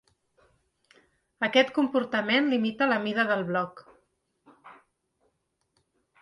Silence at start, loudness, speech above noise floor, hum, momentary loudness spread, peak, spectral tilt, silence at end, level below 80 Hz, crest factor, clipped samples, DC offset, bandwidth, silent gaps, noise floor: 1.4 s; -26 LUFS; 50 dB; none; 8 LU; -8 dBFS; -5.5 dB/octave; 1.5 s; -74 dBFS; 20 dB; under 0.1%; under 0.1%; 11 kHz; none; -75 dBFS